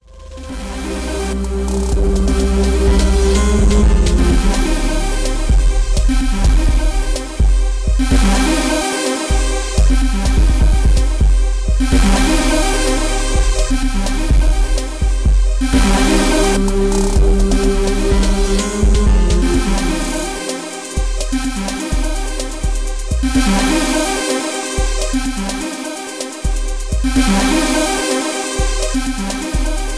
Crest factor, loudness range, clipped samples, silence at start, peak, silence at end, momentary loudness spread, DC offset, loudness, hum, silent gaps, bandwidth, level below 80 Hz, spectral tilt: 10 dB; 4 LU; under 0.1%; 0.1 s; -4 dBFS; 0 s; 8 LU; under 0.1%; -16 LUFS; none; none; 11 kHz; -16 dBFS; -4.5 dB/octave